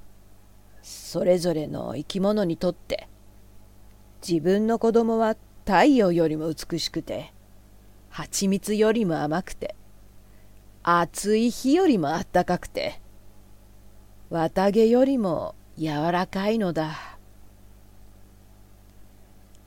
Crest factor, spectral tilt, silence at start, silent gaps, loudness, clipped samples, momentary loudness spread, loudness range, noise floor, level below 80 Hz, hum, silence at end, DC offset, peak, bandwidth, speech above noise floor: 20 dB; -5.5 dB/octave; 0.05 s; none; -24 LUFS; under 0.1%; 15 LU; 5 LU; -50 dBFS; -50 dBFS; 50 Hz at -50 dBFS; 0.1 s; under 0.1%; -6 dBFS; 17 kHz; 27 dB